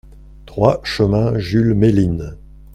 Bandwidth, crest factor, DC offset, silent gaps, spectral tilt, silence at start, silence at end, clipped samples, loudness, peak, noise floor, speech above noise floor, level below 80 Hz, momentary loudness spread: 12 kHz; 16 dB; under 0.1%; none; -8 dB/octave; 0.15 s; 0.4 s; under 0.1%; -16 LUFS; 0 dBFS; -39 dBFS; 24 dB; -36 dBFS; 12 LU